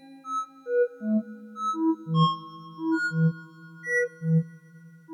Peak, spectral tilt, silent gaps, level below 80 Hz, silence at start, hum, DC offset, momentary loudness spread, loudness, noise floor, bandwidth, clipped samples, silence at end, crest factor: -12 dBFS; -7 dB/octave; none; -84 dBFS; 0.05 s; none; under 0.1%; 15 LU; -27 LUFS; -50 dBFS; 10.5 kHz; under 0.1%; 0 s; 16 dB